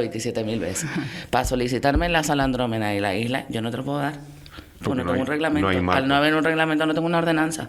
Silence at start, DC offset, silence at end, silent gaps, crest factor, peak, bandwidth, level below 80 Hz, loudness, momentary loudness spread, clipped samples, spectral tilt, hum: 0 s; under 0.1%; 0 s; none; 18 dB; -4 dBFS; 15.5 kHz; -40 dBFS; -23 LUFS; 9 LU; under 0.1%; -5 dB/octave; none